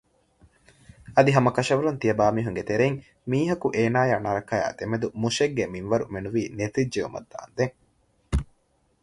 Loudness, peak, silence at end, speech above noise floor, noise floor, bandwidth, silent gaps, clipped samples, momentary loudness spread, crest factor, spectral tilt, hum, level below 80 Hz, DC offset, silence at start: -25 LUFS; -4 dBFS; 0.6 s; 42 dB; -67 dBFS; 11.5 kHz; none; under 0.1%; 9 LU; 22 dB; -6 dB/octave; none; -44 dBFS; under 0.1%; 1.05 s